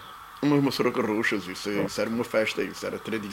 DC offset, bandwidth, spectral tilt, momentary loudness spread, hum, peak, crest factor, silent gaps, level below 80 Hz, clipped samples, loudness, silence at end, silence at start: under 0.1%; 16 kHz; -5 dB/octave; 8 LU; none; -10 dBFS; 18 dB; none; -62 dBFS; under 0.1%; -27 LUFS; 0 s; 0 s